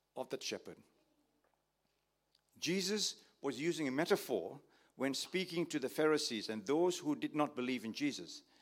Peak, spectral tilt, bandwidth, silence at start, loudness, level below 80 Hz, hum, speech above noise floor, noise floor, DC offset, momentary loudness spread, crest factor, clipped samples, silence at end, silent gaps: -18 dBFS; -3.5 dB/octave; 16.5 kHz; 0.15 s; -38 LUFS; -88 dBFS; none; 45 dB; -82 dBFS; under 0.1%; 10 LU; 22 dB; under 0.1%; 0.2 s; none